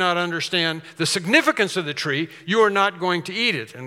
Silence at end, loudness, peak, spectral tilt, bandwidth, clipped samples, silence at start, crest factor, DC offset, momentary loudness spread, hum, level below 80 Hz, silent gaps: 0 s; -21 LUFS; -2 dBFS; -3.5 dB/octave; 16.5 kHz; under 0.1%; 0 s; 18 dB; under 0.1%; 7 LU; none; -78 dBFS; none